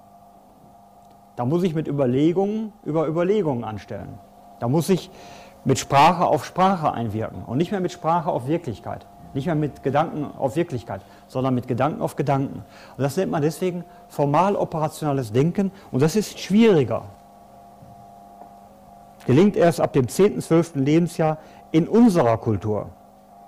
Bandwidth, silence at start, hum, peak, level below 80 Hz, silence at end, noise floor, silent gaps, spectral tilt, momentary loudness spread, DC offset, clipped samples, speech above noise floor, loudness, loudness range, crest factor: 16 kHz; 1.35 s; none; -8 dBFS; -54 dBFS; 0.55 s; -50 dBFS; none; -7 dB/octave; 16 LU; under 0.1%; under 0.1%; 29 dB; -22 LUFS; 5 LU; 14 dB